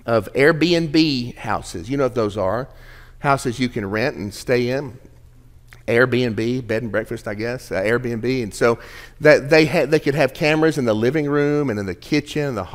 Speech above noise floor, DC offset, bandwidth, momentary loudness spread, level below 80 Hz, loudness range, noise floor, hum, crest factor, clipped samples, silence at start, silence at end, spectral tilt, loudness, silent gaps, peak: 27 dB; under 0.1%; 16 kHz; 11 LU; -44 dBFS; 6 LU; -46 dBFS; none; 20 dB; under 0.1%; 0.05 s; 0 s; -6 dB/octave; -19 LUFS; none; 0 dBFS